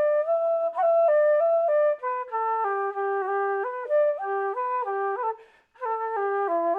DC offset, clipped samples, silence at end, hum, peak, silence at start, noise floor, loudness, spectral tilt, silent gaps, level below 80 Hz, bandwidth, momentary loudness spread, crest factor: under 0.1%; under 0.1%; 0 s; none; -14 dBFS; 0 s; -48 dBFS; -25 LUFS; -5 dB/octave; none; -82 dBFS; 3.8 kHz; 9 LU; 10 dB